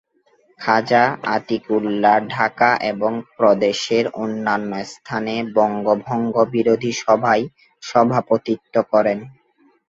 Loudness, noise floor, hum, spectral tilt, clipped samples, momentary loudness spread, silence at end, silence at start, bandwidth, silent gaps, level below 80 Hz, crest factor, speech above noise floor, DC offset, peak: -19 LUFS; -59 dBFS; none; -5.5 dB/octave; under 0.1%; 7 LU; 0.6 s; 0.6 s; 7.8 kHz; none; -62 dBFS; 18 dB; 40 dB; under 0.1%; 0 dBFS